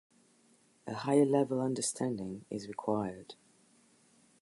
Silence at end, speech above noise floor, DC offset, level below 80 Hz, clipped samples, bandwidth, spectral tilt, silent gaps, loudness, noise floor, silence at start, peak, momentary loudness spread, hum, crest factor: 1.1 s; 35 dB; under 0.1%; -72 dBFS; under 0.1%; 11.5 kHz; -5.5 dB/octave; none; -33 LUFS; -67 dBFS; 0.85 s; -14 dBFS; 17 LU; none; 20 dB